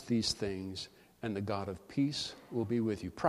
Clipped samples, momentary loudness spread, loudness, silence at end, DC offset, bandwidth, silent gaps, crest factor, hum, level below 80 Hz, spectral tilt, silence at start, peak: under 0.1%; 10 LU; -36 LUFS; 0 s; under 0.1%; 14 kHz; none; 20 dB; none; -62 dBFS; -5 dB/octave; 0 s; -14 dBFS